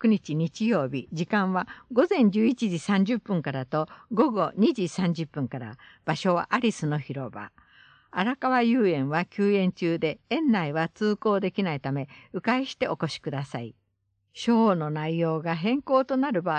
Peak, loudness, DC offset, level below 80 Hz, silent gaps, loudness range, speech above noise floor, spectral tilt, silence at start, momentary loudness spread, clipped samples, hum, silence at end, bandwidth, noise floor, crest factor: -8 dBFS; -26 LUFS; under 0.1%; -66 dBFS; none; 4 LU; 49 dB; -7 dB/octave; 0 s; 11 LU; under 0.1%; none; 0 s; 9.4 kHz; -74 dBFS; 18 dB